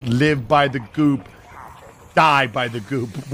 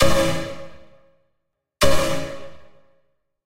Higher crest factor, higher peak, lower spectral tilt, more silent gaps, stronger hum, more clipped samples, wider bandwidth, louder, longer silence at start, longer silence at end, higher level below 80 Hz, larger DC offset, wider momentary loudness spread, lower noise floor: about the same, 18 dB vs 20 dB; about the same, -2 dBFS vs 0 dBFS; first, -6 dB/octave vs -4 dB/octave; neither; neither; neither; about the same, 15.5 kHz vs 16 kHz; first, -19 LUFS vs -22 LUFS; about the same, 0 s vs 0 s; about the same, 0 s vs 0 s; second, -50 dBFS vs -36 dBFS; neither; second, 11 LU vs 22 LU; second, -42 dBFS vs -75 dBFS